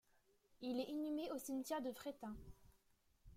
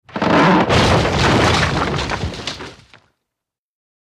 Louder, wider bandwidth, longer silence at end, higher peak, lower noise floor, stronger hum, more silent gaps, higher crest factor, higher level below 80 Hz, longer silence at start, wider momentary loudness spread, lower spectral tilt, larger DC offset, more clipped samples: second, -46 LUFS vs -15 LUFS; first, 16.5 kHz vs 14 kHz; second, 0 s vs 1.35 s; second, -32 dBFS vs -2 dBFS; second, -77 dBFS vs -83 dBFS; neither; neither; about the same, 16 dB vs 16 dB; second, -70 dBFS vs -32 dBFS; first, 0.55 s vs 0.15 s; second, 10 LU vs 14 LU; about the same, -4.5 dB/octave vs -5 dB/octave; neither; neither